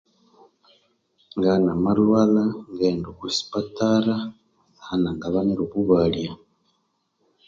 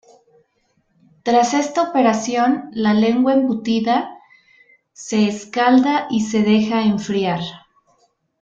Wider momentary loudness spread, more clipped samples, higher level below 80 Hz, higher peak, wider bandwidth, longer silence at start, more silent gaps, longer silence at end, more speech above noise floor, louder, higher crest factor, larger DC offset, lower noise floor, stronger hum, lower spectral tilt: first, 11 LU vs 7 LU; neither; first, -52 dBFS vs -60 dBFS; about the same, -4 dBFS vs -4 dBFS; about the same, 7.6 kHz vs 7.8 kHz; about the same, 1.35 s vs 1.25 s; neither; first, 1.15 s vs 0.85 s; about the same, 50 dB vs 48 dB; second, -22 LUFS vs -18 LUFS; about the same, 18 dB vs 16 dB; neither; first, -71 dBFS vs -65 dBFS; neither; first, -6.5 dB/octave vs -5 dB/octave